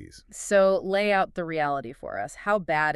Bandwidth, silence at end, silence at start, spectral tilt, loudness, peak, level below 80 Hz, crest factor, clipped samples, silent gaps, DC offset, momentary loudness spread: 12.5 kHz; 0 s; 0 s; -4.5 dB/octave; -25 LUFS; -10 dBFS; -56 dBFS; 16 dB; under 0.1%; none; under 0.1%; 14 LU